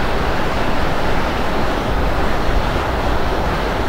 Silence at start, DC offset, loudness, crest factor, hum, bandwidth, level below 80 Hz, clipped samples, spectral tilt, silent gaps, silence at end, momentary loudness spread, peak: 0 s; under 0.1%; -19 LUFS; 12 dB; none; 16 kHz; -22 dBFS; under 0.1%; -5.5 dB/octave; none; 0 s; 0 LU; -4 dBFS